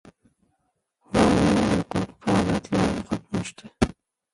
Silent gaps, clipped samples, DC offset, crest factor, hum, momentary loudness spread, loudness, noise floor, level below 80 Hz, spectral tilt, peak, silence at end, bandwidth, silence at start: none; under 0.1%; under 0.1%; 18 dB; none; 10 LU; -24 LUFS; -74 dBFS; -42 dBFS; -6 dB/octave; -6 dBFS; 0.45 s; 11.5 kHz; 1.1 s